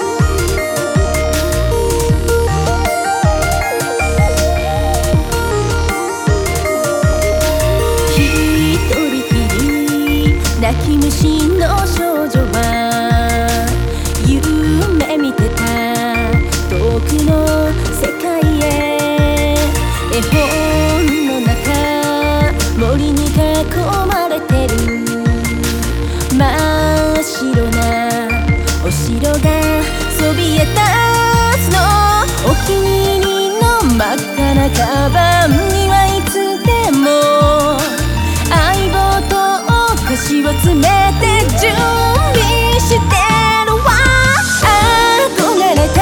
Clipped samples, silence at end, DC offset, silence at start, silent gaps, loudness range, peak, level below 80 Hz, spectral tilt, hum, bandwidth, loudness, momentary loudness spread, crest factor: under 0.1%; 0 s; under 0.1%; 0 s; none; 3 LU; 0 dBFS; -20 dBFS; -5 dB/octave; none; over 20 kHz; -13 LUFS; 5 LU; 12 dB